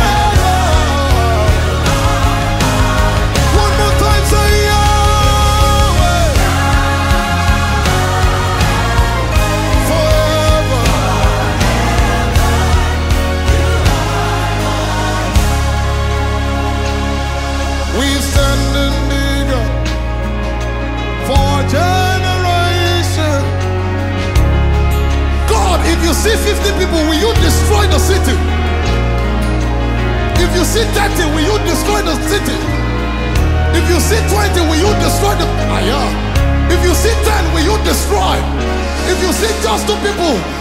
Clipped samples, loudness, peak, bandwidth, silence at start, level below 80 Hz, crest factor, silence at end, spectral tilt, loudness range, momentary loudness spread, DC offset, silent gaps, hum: under 0.1%; -13 LUFS; 0 dBFS; 16 kHz; 0 s; -16 dBFS; 12 dB; 0 s; -5 dB/octave; 3 LU; 5 LU; under 0.1%; none; none